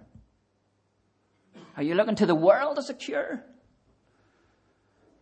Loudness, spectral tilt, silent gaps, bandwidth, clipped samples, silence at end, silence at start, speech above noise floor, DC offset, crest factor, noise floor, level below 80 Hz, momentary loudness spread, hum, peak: -25 LUFS; -6 dB/octave; none; 9 kHz; under 0.1%; 1.8 s; 1.55 s; 46 dB; under 0.1%; 22 dB; -71 dBFS; -70 dBFS; 15 LU; none; -8 dBFS